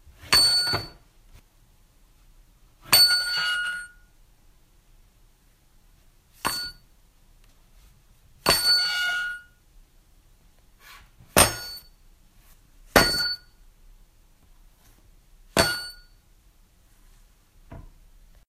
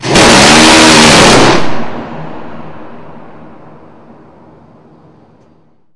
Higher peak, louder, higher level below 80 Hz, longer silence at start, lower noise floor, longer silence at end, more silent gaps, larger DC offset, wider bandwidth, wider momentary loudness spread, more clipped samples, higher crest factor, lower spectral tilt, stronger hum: about the same, 0 dBFS vs 0 dBFS; second, -21 LUFS vs -3 LUFS; second, -48 dBFS vs -32 dBFS; first, 0.25 s vs 0 s; first, -59 dBFS vs -49 dBFS; second, 0.6 s vs 2.8 s; neither; neither; first, 16 kHz vs 12 kHz; second, 20 LU vs 24 LU; second, under 0.1% vs 3%; first, 28 dB vs 10 dB; second, -1.5 dB/octave vs -3 dB/octave; neither